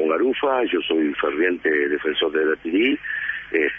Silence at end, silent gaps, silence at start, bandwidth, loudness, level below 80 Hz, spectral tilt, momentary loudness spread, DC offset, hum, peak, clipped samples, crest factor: 0 s; none; 0 s; 3.7 kHz; -21 LUFS; -58 dBFS; -6.5 dB/octave; 3 LU; under 0.1%; 50 Hz at -60 dBFS; -6 dBFS; under 0.1%; 16 dB